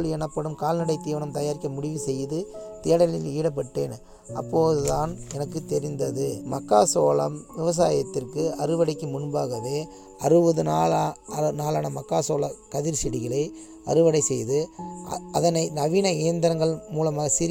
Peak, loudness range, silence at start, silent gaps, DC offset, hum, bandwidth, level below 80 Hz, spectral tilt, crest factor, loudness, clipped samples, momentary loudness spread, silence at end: -4 dBFS; 3 LU; 0 s; none; under 0.1%; none; 17 kHz; -50 dBFS; -5.5 dB/octave; 20 dB; -25 LUFS; under 0.1%; 11 LU; 0 s